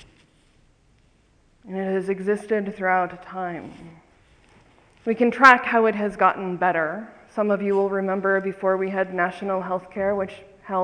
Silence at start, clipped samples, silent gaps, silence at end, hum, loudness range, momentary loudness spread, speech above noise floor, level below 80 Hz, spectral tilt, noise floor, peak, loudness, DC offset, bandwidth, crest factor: 1.65 s; under 0.1%; none; 0 s; none; 8 LU; 15 LU; 37 dB; -60 dBFS; -6.5 dB/octave; -60 dBFS; 0 dBFS; -22 LUFS; under 0.1%; 10.5 kHz; 24 dB